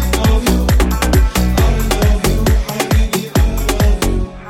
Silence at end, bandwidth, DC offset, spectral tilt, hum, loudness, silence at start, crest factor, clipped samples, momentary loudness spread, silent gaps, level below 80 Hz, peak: 0 s; 16.5 kHz; under 0.1%; -5 dB/octave; none; -15 LUFS; 0 s; 12 dB; under 0.1%; 3 LU; none; -14 dBFS; -2 dBFS